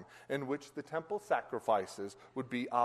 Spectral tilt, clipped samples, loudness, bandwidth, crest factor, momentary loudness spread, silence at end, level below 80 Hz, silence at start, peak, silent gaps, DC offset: -5.5 dB/octave; under 0.1%; -38 LUFS; 13 kHz; 20 dB; 10 LU; 0 s; -78 dBFS; 0 s; -18 dBFS; none; under 0.1%